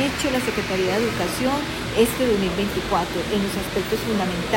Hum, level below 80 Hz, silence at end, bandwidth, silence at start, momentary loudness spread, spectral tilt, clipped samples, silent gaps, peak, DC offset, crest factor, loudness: none; -40 dBFS; 0 s; 16.5 kHz; 0 s; 4 LU; -4.5 dB/octave; under 0.1%; none; -6 dBFS; under 0.1%; 16 dB; -22 LUFS